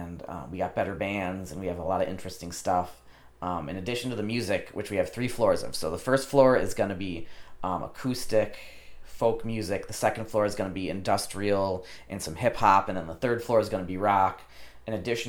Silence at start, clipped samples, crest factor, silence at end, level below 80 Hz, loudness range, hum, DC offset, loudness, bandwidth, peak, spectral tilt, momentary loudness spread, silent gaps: 0 s; under 0.1%; 22 dB; 0 s; -50 dBFS; 5 LU; none; under 0.1%; -28 LUFS; 19 kHz; -6 dBFS; -5 dB/octave; 13 LU; none